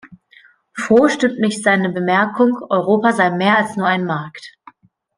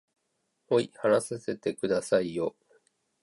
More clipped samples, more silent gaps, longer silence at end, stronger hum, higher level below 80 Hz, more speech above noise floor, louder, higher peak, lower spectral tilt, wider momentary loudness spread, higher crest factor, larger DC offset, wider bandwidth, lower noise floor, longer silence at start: neither; neither; about the same, 0.7 s vs 0.75 s; neither; first, -62 dBFS vs -70 dBFS; second, 34 dB vs 50 dB; first, -16 LUFS vs -29 LUFS; first, -2 dBFS vs -12 dBFS; about the same, -5.5 dB/octave vs -5 dB/octave; first, 12 LU vs 7 LU; about the same, 16 dB vs 18 dB; neither; about the same, 10.5 kHz vs 11.5 kHz; second, -50 dBFS vs -78 dBFS; second, 0.05 s vs 0.7 s